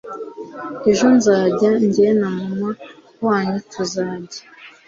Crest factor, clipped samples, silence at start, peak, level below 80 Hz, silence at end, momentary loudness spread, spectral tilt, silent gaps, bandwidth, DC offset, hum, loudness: 16 dB; under 0.1%; 0.05 s; -2 dBFS; -58 dBFS; 0.2 s; 18 LU; -5.5 dB/octave; none; 7.8 kHz; under 0.1%; none; -18 LUFS